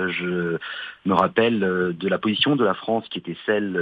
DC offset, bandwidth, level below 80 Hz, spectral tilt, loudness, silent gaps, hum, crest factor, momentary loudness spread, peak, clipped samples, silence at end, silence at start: under 0.1%; 5.4 kHz; -64 dBFS; -8 dB/octave; -22 LUFS; none; none; 18 dB; 9 LU; -4 dBFS; under 0.1%; 0 s; 0 s